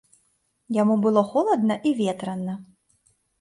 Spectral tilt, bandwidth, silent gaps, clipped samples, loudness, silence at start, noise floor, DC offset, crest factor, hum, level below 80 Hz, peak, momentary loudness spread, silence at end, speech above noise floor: -7 dB/octave; 11.5 kHz; none; under 0.1%; -23 LUFS; 0.7 s; -69 dBFS; under 0.1%; 18 dB; none; -70 dBFS; -6 dBFS; 11 LU; 0.75 s; 47 dB